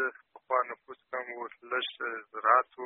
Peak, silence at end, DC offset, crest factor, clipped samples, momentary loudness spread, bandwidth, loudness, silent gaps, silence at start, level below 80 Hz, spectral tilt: -8 dBFS; 0 s; under 0.1%; 24 dB; under 0.1%; 15 LU; 4 kHz; -31 LUFS; none; 0 s; -88 dBFS; 2 dB/octave